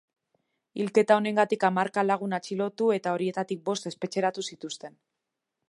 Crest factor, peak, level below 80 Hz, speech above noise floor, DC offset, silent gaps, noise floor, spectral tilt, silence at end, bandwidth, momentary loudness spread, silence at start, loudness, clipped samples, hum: 22 dB; -6 dBFS; -80 dBFS; 58 dB; under 0.1%; none; -85 dBFS; -5 dB/octave; 0.8 s; 11.5 kHz; 15 LU; 0.75 s; -27 LUFS; under 0.1%; none